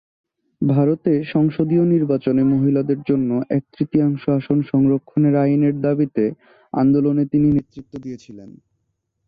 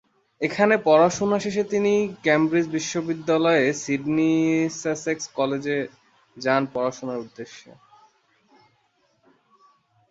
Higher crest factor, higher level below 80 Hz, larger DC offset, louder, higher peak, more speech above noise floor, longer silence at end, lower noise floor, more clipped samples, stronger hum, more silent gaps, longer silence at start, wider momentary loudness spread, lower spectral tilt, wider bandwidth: second, 14 dB vs 20 dB; first, -54 dBFS vs -66 dBFS; neither; first, -18 LUFS vs -22 LUFS; about the same, -6 dBFS vs -4 dBFS; first, 55 dB vs 44 dB; second, 0.75 s vs 2.5 s; first, -72 dBFS vs -66 dBFS; neither; neither; neither; first, 0.6 s vs 0.4 s; second, 7 LU vs 11 LU; first, -11 dB/octave vs -5 dB/octave; second, 5 kHz vs 8 kHz